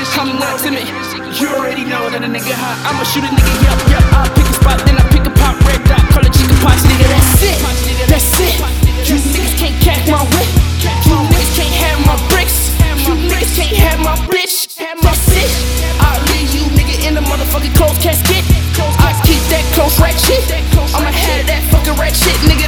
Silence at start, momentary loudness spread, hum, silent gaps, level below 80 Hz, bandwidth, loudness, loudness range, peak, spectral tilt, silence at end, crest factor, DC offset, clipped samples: 0 s; 6 LU; none; none; -14 dBFS; 19.5 kHz; -11 LUFS; 3 LU; 0 dBFS; -4.5 dB/octave; 0 s; 10 dB; 0.3%; 1%